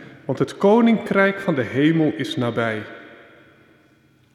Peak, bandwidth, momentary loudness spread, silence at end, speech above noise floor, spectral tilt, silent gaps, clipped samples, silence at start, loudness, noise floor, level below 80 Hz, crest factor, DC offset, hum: -4 dBFS; 12 kHz; 14 LU; 1.2 s; 38 dB; -7 dB/octave; none; under 0.1%; 0 s; -20 LUFS; -56 dBFS; -64 dBFS; 16 dB; under 0.1%; none